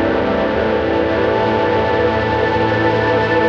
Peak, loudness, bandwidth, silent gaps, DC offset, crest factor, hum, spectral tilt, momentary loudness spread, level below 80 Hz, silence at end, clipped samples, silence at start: -4 dBFS; -16 LUFS; 7.2 kHz; none; under 0.1%; 12 dB; none; -7.5 dB/octave; 2 LU; -36 dBFS; 0 s; under 0.1%; 0 s